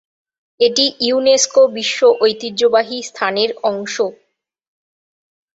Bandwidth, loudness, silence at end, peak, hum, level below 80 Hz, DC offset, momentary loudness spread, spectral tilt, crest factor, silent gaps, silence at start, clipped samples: 8 kHz; -15 LUFS; 1.45 s; 0 dBFS; none; -64 dBFS; under 0.1%; 8 LU; -1.5 dB/octave; 16 dB; none; 0.6 s; under 0.1%